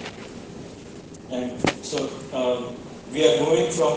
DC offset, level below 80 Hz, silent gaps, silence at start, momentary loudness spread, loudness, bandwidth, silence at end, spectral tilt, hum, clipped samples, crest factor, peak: under 0.1%; -56 dBFS; none; 0 s; 20 LU; -24 LUFS; 9.8 kHz; 0 s; -4 dB/octave; none; under 0.1%; 20 dB; -6 dBFS